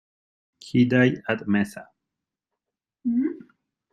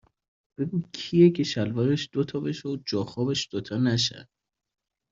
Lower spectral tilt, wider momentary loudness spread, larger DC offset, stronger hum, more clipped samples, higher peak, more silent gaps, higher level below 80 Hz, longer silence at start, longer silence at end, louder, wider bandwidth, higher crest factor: first, -7.5 dB/octave vs -6 dB/octave; about the same, 13 LU vs 11 LU; neither; neither; neither; about the same, -6 dBFS vs -6 dBFS; neither; about the same, -64 dBFS vs -62 dBFS; about the same, 0.65 s vs 0.6 s; second, 0.55 s vs 0.9 s; about the same, -24 LUFS vs -26 LUFS; first, 12 kHz vs 7.8 kHz; about the same, 20 dB vs 20 dB